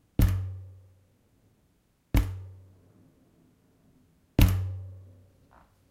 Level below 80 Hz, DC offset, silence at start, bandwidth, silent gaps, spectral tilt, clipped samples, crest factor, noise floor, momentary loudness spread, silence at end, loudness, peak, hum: -36 dBFS; under 0.1%; 0.2 s; 16.5 kHz; none; -6.5 dB/octave; under 0.1%; 24 dB; -69 dBFS; 23 LU; 0.9 s; -29 LUFS; -6 dBFS; none